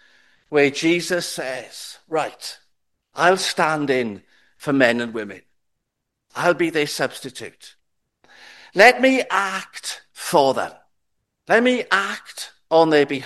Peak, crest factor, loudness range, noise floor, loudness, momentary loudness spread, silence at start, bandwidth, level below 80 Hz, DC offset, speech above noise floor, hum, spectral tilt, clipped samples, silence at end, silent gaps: 0 dBFS; 22 dB; 5 LU; -79 dBFS; -19 LUFS; 18 LU; 0.5 s; 13.5 kHz; -68 dBFS; under 0.1%; 59 dB; none; -3.5 dB/octave; under 0.1%; 0 s; none